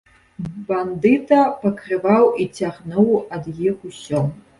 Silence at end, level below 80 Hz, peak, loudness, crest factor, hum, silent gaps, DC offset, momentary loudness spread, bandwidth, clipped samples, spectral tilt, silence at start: 0.2 s; -56 dBFS; -2 dBFS; -19 LUFS; 16 dB; none; none; under 0.1%; 15 LU; 11.5 kHz; under 0.1%; -7.5 dB/octave; 0.4 s